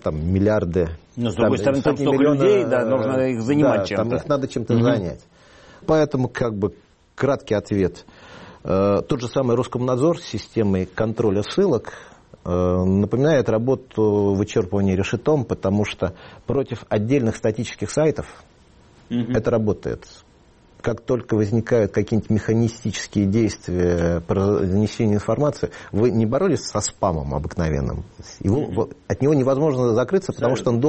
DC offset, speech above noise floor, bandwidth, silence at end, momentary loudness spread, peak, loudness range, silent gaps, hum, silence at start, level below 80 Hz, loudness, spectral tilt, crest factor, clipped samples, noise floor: under 0.1%; 32 dB; 8.4 kHz; 0 s; 9 LU; -6 dBFS; 4 LU; none; none; 0.05 s; -42 dBFS; -21 LUFS; -7 dB/octave; 14 dB; under 0.1%; -52 dBFS